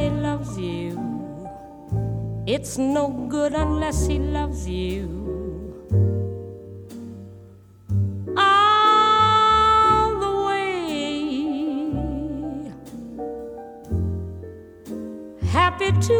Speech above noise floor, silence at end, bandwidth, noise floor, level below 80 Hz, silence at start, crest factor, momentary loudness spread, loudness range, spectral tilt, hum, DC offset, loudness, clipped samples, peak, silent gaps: 23 dB; 0 s; 15 kHz; -46 dBFS; -36 dBFS; 0 s; 18 dB; 22 LU; 11 LU; -5.5 dB/octave; none; under 0.1%; -22 LUFS; under 0.1%; -4 dBFS; none